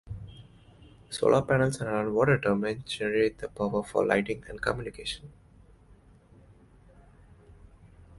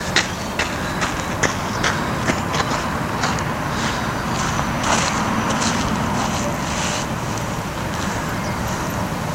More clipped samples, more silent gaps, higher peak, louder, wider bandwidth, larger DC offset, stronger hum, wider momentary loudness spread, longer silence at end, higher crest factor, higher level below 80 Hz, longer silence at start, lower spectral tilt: neither; neither; second, -8 dBFS vs 0 dBFS; second, -28 LUFS vs -21 LUFS; second, 11.5 kHz vs 16 kHz; neither; neither; first, 14 LU vs 4 LU; about the same, 0 s vs 0 s; about the same, 22 dB vs 20 dB; second, -54 dBFS vs -36 dBFS; about the same, 0.05 s vs 0 s; first, -6 dB/octave vs -4 dB/octave